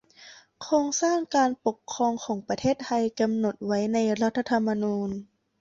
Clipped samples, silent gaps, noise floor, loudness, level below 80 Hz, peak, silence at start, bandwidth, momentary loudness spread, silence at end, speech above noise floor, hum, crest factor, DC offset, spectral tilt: under 0.1%; none; -51 dBFS; -26 LUFS; -64 dBFS; -10 dBFS; 0.2 s; 7.8 kHz; 7 LU; 0.35 s; 26 dB; none; 16 dB; under 0.1%; -4.5 dB/octave